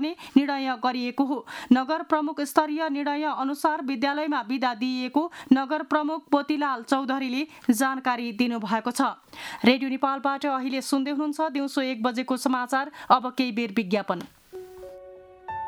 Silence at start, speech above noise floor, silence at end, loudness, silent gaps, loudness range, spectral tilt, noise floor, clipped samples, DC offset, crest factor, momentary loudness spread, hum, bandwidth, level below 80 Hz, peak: 0 s; 21 dB; 0 s; -26 LUFS; none; 1 LU; -4 dB/octave; -47 dBFS; under 0.1%; under 0.1%; 22 dB; 7 LU; none; 14.5 kHz; -70 dBFS; -4 dBFS